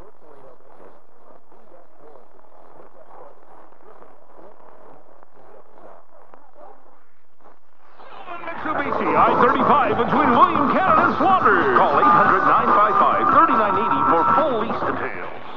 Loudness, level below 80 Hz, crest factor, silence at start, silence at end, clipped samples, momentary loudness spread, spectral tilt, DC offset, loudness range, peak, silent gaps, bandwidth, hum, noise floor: -17 LUFS; -54 dBFS; 18 dB; 3.2 s; 0 s; under 0.1%; 11 LU; -7.5 dB/octave; 3%; 9 LU; -2 dBFS; none; 6.6 kHz; none; -58 dBFS